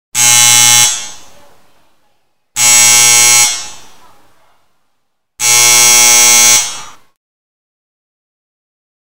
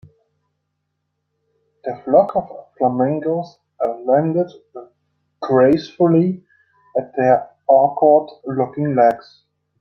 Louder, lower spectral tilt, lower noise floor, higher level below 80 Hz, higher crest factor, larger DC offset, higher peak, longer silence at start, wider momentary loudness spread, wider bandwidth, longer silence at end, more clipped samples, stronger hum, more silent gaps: first, -4 LUFS vs -17 LUFS; second, 1.5 dB/octave vs -9 dB/octave; second, -67 dBFS vs -74 dBFS; first, -52 dBFS vs -62 dBFS; second, 12 dB vs 18 dB; first, 3% vs under 0.1%; about the same, 0 dBFS vs -2 dBFS; second, 0.15 s vs 1.85 s; about the same, 16 LU vs 16 LU; first, over 20 kHz vs 6.2 kHz; first, 2.2 s vs 0.6 s; first, 0.9% vs under 0.1%; neither; neither